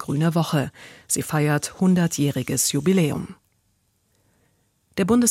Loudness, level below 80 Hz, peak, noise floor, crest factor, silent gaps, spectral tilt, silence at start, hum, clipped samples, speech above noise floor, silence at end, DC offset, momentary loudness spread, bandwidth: -22 LUFS; -56 dBFS; -6 dBFS; -67 dBFS; 16 dB; none; -5 dB/octave; 0 s; none; under 0.1%; 46 dB; 0 s; under 0.1%; 10 LU; 16.5 kHz